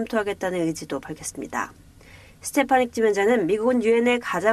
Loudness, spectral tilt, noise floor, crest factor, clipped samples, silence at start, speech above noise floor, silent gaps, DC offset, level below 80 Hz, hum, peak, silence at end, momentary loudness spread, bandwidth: -23 LUFS; -4.5 dB/octave; -48 dBFS; 18 dB; under 0.1%; 0 s; 26 dB; none; under 0.1%; -56 dBFS; none; -6 dBFS; 0 s; 13 LU; 14.5 kHz